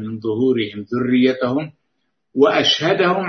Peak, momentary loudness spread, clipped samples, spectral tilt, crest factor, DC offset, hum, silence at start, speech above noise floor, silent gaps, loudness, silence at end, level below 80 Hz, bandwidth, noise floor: -2 dBFS; 10 LU; under 0.1%; -5 dB/octave; 18 dB; under 0.1%; none; 0 s; 56 dB; none; -17 LUFS; 0 s; -64 dBFS; 6.6 kHz; -73 dBFS